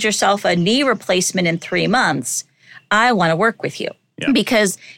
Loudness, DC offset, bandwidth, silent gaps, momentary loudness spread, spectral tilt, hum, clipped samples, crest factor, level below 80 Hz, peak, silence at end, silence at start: -17 LUFS; under 0.1%; 17 kHz; none; 9 LU; -3.5 dB/octave; none; under 0.1%; 16 dB; -56 dBFS; -2 dBFS; 0.05 s; 0 s